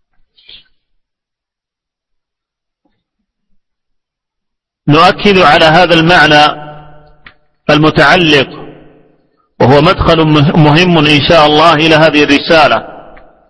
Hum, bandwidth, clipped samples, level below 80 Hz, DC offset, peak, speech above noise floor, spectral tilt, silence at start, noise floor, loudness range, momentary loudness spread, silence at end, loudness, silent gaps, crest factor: none; 11 kHz; 1%; -34 dBFS; under 0.1%; 0 dBFS; 76 dB; -6 dB/octave; 4.85 s; -82 dBFS; 5 LU; 6 LU; 0.5 s; -6 LUFS; none; 10 dB